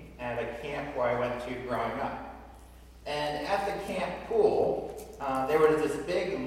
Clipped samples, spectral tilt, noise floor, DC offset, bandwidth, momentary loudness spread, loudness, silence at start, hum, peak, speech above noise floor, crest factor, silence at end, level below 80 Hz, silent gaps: under 0.1%; -5.5 dB/octave; -51 dBFS; under 0.1%; 15.5 kHz; 12 LU; -30 LUFS; 0 s; none; -10 dBFS; 21 dB; 20 dB; 0 s; -52 dBFS; none